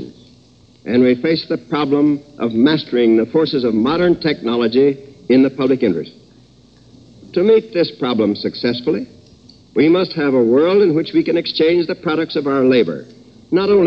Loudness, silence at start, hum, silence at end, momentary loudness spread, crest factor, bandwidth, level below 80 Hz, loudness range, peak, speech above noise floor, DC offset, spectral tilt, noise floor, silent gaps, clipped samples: -16 LUFS; 0 s; none; 0 s; 8 LU; 14 dB; 6.6 kHz; -54 dBFS; 3 LU; -2 dBFS; 34 dB; under 0.1%; -8 dB/octave; -48 dBFS; none; under 0.1%